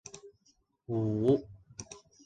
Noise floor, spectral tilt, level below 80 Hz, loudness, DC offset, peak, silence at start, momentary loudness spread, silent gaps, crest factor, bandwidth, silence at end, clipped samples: -71 dBFS; -7.5 dB/octave; -64 dBFS; -31 LUFS; under 0.1%; -14 dBFS; 0.15 s; 21 LU; none; 20 dB; 9.4 kHz; 0.25 s; under 0.1%